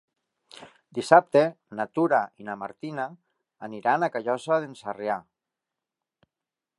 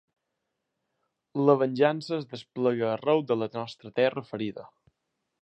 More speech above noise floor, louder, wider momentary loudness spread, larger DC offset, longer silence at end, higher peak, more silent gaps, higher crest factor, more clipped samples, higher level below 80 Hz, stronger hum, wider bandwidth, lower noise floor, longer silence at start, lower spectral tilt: first, 64 dB vs 55 dB; about the same, -26 LUFS vs -27 LUFS; first, 16 LU vs 13 LU; neither; first, 1.55 s vs 0.75 s; first, -2 dBFS vs -8 dBFS; neither; about the same, 26 dB vs 22 dB; neither; about the same, -78 dBFS vs -76 dBFS; neither; first, 11.5 kHz vs 8.6 kHz; first, -89 dBFS vs -82 dBFS; second, 0.55 s vs 1.35 s; second, -6 dB/octave vs -7.5 dB/octave